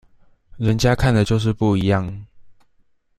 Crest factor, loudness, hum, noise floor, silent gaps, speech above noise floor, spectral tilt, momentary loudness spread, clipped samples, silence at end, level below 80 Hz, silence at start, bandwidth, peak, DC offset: 18 dB; -19 LUFS; none; -59 dBFS; none; 41 dB; -6.5 dB/octave; 9 LU; under 0.1%; 0.65 s; -38 dBFS; 0.55 s; 14 kHz; -2 dBFS; under 0.1%